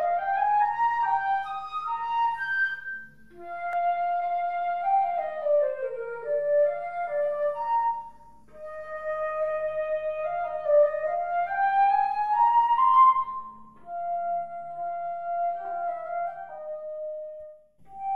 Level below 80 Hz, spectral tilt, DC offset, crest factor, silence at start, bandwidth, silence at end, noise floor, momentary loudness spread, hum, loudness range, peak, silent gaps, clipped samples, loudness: -66 dBFS; -4.5 dB/octave; 0.3%; 16 dB; 0 s; 5.4 kHz; 0 s; -52 dBFS; 15 LU; none; 9 LU; -10 dBFS; none; under 0.1%; -26 LUFS